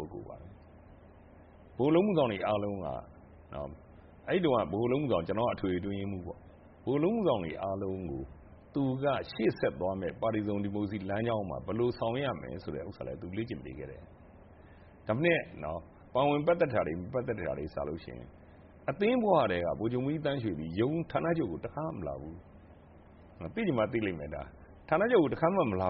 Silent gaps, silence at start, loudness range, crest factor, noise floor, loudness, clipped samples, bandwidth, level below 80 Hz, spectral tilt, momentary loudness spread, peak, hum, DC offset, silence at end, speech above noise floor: none; 0 s; 5 LU; 20 dB; -55 dBFS; -32 LUFS; under 0.1%; 5.4 kHz; -56 dBFS; -6 dB/octave; 16 LU; -12 dBFS; none; under 0.1%; 0 s; 24 dB